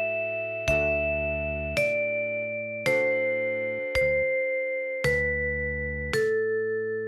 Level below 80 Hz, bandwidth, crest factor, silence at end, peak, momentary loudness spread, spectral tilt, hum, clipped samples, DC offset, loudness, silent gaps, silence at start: -42 dBFS; 14.5 kHz; 18 dB; 0 s; -10 dBFS; 5 LU; -5 dB/octave; none; under 0.1%; under 0.1%; -26 LUFS; none; 0 s